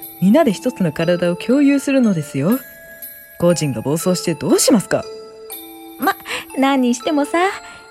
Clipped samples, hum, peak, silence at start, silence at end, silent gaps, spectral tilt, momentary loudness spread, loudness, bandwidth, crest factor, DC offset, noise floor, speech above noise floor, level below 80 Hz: under 0.1%; none; -2 dBFS; 0 s; 0.1 s; none; -5 dB/octave; 19 LU; -17 LUFS; 16.5 kHz; 16 dB; under 0.1%; -36 dBFS; 21 dB; -56 dBFS